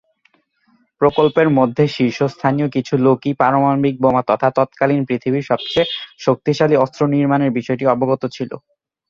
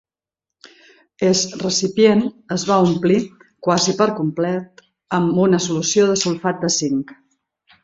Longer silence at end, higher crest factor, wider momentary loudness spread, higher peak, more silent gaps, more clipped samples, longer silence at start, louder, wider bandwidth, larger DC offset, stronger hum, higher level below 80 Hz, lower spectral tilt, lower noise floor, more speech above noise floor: second, 0.5 s vs 0.7 s; about the same, 16 dB vs 18 dB; second, 5 LU vs 9 LU; about the same, -2 dBFS vs -2 dBFS; neither; neither; second, 1 s vs 1.2 s; about the same, -17 LUFS vs -18 LUFS; about the same, 7.4 kHz vs 8 kHz; neither; neither; about the same, -54 dBFS vs -58 dBFS; first, -7.5 dB/octave vs -4.5 dB/octave; second, -60 dBFS vs -86 dBFS; second, 44 dB vs 68 dB